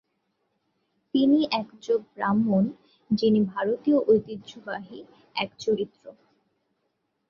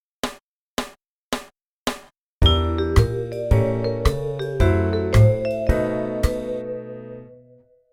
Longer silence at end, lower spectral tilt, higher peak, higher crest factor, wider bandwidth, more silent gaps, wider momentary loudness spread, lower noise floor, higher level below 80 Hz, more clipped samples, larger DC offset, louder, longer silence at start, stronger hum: first, 1.2 s vs 0.6 s; about the same, -7 dB/octave vs -6.5 dB/octave; second, -10 dBFS vs -2 dBFS; about the same, 18 dB vs 20 dB; second, 7.2 kHz vs 16 kHz; second, none vs 0.43-0.77 s, 1.08-1.31 s, 1.64-1.86 s, 2.18-2.41 s; about the same, 15 LU vs 14 LU; first, -76 dBFS vs -53 dBFS; second, -66 dBFS vs -28 dBFS; neither; neither; second, -25 LUFS vs -22 LUFS; first, 1.15 s vs 0.25 s; neither